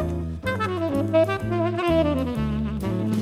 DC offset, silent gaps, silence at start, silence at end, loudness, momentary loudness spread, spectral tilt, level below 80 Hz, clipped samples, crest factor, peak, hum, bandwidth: under 0.1%; none; 0 s; 0 s; -24 LUFS; 6 LU; -7.5 dB/octave; -40 dBFS; under 0.1%; 16 dB; -8 dBFS; none; 15.5 kHz